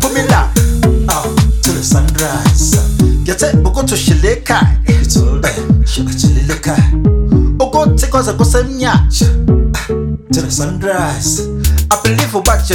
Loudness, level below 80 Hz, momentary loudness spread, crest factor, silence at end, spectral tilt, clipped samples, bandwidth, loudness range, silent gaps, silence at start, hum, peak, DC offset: -12 LUFS; -16 dBFS; 4 LU; 10 dB; 0 s; -5 dB/octave; under 0.1%; 18 kHz; 2 LU; none; 0 s; none; 0 dBFS; under 0.1%